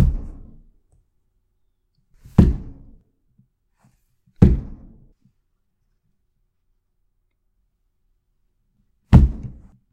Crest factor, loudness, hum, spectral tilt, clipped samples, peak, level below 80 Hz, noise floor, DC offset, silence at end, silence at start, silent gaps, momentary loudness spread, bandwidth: 24 dB; -18 LUFS; none; -10 dB/octave; under 0.1%; 0 dBFS; -28 dBFS; -69 dBFS; under 0.1%; 0.4 s; 0 s; none; 25 LU; 8 kHz